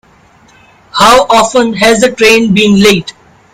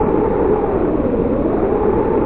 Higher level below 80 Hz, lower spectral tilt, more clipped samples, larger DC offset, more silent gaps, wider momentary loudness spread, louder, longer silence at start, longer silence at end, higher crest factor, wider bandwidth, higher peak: second, -38 dBFS vs -28 dBFS; second, -4 dB/octave vs -13 dB/octave; first, 2% vs under 0.1%; second, under 0.1% vs 1%; neither; first, 6 LU vs 1 LU; first, -7 LUFS vs -17 LUFS; first, 0.95 s vs 0 s; first, 0.45 s vs 0 s; about the same, 8 dB vs 12 dB; first, 18.5 kHz vs 4 kHz; first, 0 dBFS vs -4 dBFS